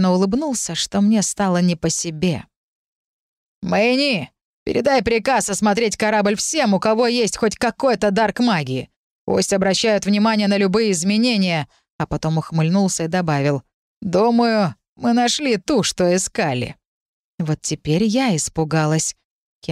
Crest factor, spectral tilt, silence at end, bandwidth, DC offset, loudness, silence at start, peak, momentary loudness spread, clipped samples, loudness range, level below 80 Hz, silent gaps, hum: 14 dB; -4.5 dB/octave; 0 s; 14.5 kHz; under 0.1%; -19 LUFS; 0 s; -6 dBFS; 8 LU; under 0.1%; 3 LU; -48 dBFS; 2.56-3.62 s, 4.44-4.66 s, 8.96-9.27 s, 11.90-11.99 s, 13.74-14.01 s, 14.88-14.96 s, 16.85-17.38 s, 19.25-19.62 s; none